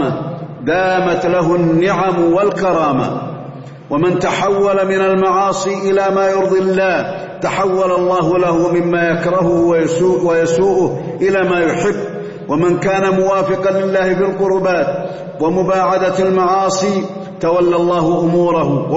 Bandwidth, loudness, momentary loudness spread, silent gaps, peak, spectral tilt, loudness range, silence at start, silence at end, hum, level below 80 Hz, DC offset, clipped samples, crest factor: 8 kHz; -14 LUFS; 7 LU; none; -4 dBFS; -6 dB/octave; 1 LU; 0 s; 0 s; none; -46 dBFS; under 0.1%; under 0.1%; 10 dB